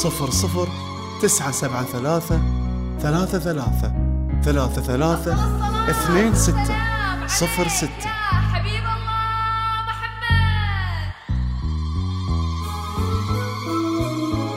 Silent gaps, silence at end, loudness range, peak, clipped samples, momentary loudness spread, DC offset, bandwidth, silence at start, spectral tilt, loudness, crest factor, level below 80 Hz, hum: none; 0 s; 4 LU; -4 dBFS; under 0.1%; 7 LU; under 0.1%; 16 kHz; 0 s; -4.5 dB/octave; -22 LUFS; 16 dB; -28 dBFS; none